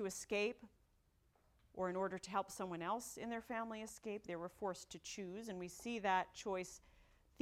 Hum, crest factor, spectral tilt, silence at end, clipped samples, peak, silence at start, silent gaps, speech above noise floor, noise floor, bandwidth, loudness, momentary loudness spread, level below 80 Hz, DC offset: none; 22 dB; -4 dB/octave; 0.4 s; under 0.1%; -24 dBFS; 0 s; none; 32 dB; -76 dBFS; 16.5 kHz; -44 LUFS; 9 LU; -74 dBFS; under 0.1%